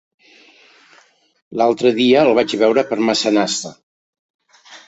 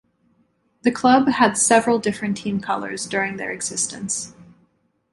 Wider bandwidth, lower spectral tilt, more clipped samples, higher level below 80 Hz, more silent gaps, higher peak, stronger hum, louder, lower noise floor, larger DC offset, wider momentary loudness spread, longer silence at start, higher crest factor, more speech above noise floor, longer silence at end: second, 8.2 kHz vs 11.5 kHz; about the same, -4 dB/octave vs -3.5 dB/octave; neither; about the same, -62 dBFS vs -60 dBFS; first, 3.83-4.13 s, 4.19-4.39 s vs none; about the same, -2 dBFS vs -2 dBFS; neither; first, -15 LUFS vs -20 LUFS; second, -52 dBFS vs -64 dBFS; neither; about the same, 10 LU vs 10 LU; first, 1.5 s vs 0.85 s; about the same, 16 dB vs 20 dB; second, 37 dB vs 44 dB; second, 0.1 s vs 0.7 s